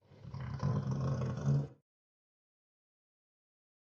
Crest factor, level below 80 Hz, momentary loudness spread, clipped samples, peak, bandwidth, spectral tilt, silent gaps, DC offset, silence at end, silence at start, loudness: 16 dB; -60 dBFS; 12 LU; under 0.1%; -22 dBFS; 7 kHz; -8.5 dB/octave; none; under 0.1%; 2.2 s; 0.1 s; -37 LUFS